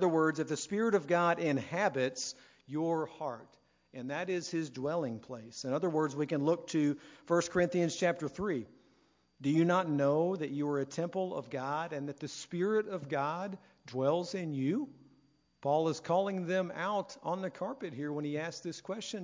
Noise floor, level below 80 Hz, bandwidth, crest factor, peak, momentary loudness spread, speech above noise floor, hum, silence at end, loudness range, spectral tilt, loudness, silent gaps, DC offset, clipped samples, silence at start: -70 dBFS; -72 dBFS; 7.6 kHz; 18 dB; -14 dBFS; 11 LU; 37 dB; none; 0 s; 4 LU; -5.5 dB/octave; -34 LUFS; none; under 0.1%; under 0.1%; 0 s